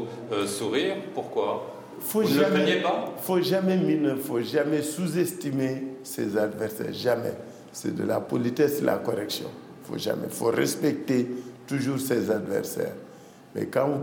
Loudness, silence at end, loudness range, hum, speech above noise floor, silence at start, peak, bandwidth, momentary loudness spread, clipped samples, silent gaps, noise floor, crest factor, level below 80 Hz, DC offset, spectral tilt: -27 LUFS; 0 s; 4 LU; none; 22 dB; 0 s; -8 dBFS; 17 kHz; 11 LU; under 0.1%; none; -48 dBFS; 18 dB; -74 dBFS; under 0.1%; -5 dB/octave